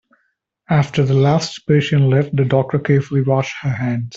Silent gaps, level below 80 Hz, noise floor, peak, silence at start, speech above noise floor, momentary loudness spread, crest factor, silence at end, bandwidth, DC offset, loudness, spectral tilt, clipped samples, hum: none; -50 dBFS; -68 dBFS; -2 dBFS; 0.7 s; 52 dB; 5 LU; 14 dB; 0 s; 7.6 kHz; under 0.1%; -17 LUFS; -7 dB/octave; under 0.1%; none